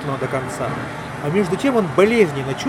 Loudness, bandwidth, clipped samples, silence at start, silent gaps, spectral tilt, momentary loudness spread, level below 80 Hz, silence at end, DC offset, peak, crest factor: -19 LUFS; 14 kHz; under 0.1%; 0 s; none; -6 dB/octave; 11 LU; -48 dBFS; 0 s; under 0.1%; -2 dBFS; 18 dB